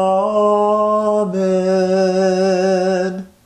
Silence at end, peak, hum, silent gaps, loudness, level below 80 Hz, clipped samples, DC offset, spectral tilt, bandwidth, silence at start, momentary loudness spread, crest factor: 0.2 s; -6 dBFS; none; none; -16 LUFS; -58 dBFS; under 0.1%; under 0.1%; -6.5 dB/octave; 10.5 kHz; 0 s; 3 LU; 10 dB